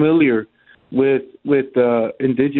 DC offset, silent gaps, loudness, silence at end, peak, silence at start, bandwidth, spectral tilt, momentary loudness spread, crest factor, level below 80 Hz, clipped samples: under 0.1%; none; -18 LUFS; 0 s; -4 dBFS; 0 s; 4.2 kHz; -12 dB/octave; 6 LU; 14 dB; -58 dBFS; under 0.1%